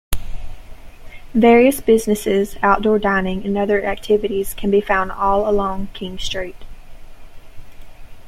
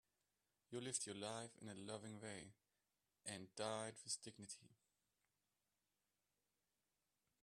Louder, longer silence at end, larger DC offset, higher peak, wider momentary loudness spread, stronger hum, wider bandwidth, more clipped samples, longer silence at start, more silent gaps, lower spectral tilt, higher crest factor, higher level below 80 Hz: first, -17 LUFS vs -51 LUFS; second, 0 s vs 2.7 s; neither; first, -2 dBFS vs -30 dBFS; first, 15 LU vs 11 LU; second, none vs 50 Hz at -80 dBFS; first, 16.5 kHz vs 13 kHz; neither; second, 0.1 s vs 0.7 s; neither; first, -5 dB/octave vs -3 dB/octave; second, 16 dB vs 26 dB; first, -34 dBFS vs under -90 dBFS